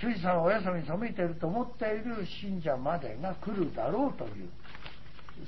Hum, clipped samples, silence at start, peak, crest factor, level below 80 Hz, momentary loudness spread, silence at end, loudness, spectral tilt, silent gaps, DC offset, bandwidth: none; under 0.1%; 0 s; -14 dBFS; 18 dB; -54 dBFS; 19 LU; 0 s; -33 LUFS; -5.5 dB/octave; none; 1%; 6 kHz